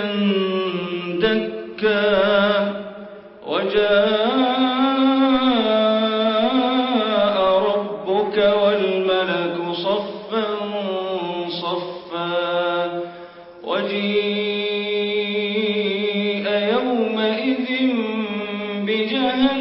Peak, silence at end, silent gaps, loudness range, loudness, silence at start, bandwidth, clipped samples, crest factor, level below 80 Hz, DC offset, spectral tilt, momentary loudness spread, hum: -4 dBFS; 0 s; none; 6 LU; -20 LUFS; 0 s; 5.8 kHz; under 0.1%; 16 dB; -58 dBFS; under 0.1%; -10 dB/octave; 9 LU; none